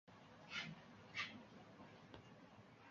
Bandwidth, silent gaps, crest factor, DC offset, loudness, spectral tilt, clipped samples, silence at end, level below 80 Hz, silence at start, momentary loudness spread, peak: 7.6 kHz; none; 24 dB; under 0.1%; -53 LUFS; -1.5 dB/octave; under 0.1%; 0 s; -82 dBFS; 0.05 s; 15 LU; -32 dBFS